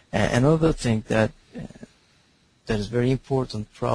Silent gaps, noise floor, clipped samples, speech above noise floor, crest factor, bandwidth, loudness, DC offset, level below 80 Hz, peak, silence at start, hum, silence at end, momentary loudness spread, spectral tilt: none; -61 dBFS; under 0.1%; 39 dB; 20 dB; 10.5 kHz; -23 LUFS; under 0.1%; -42 dBFS; -4 dBFS; 0.15 s; none; 0 s; 20 LU; -6.5 dB/octave